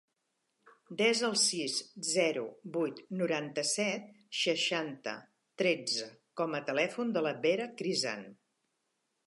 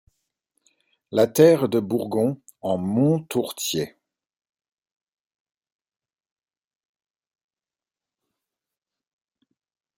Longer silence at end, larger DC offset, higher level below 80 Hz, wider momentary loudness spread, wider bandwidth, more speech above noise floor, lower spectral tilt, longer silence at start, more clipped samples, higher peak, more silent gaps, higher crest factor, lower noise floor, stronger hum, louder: second, 0.95 s vs 6.1 s; neither; second, -88 dBFS vs -68 dBFS; about the same, 11 LU vs 12 LU; second, 11.5 kHz vs 16.5 kHz; second, 49 dB vs over 69 dB; second, -2.5 dB/octave vs -6 dB/octave; second, 0.65 s vs 1.1 s; neither; second, -16 dBFS vs -2 dBFS; neither; second, 18 dB vs 24 dB; second, -82 dBFS vs under -90 dBFS; neither; second, -32 LUFS vs -22 LUFS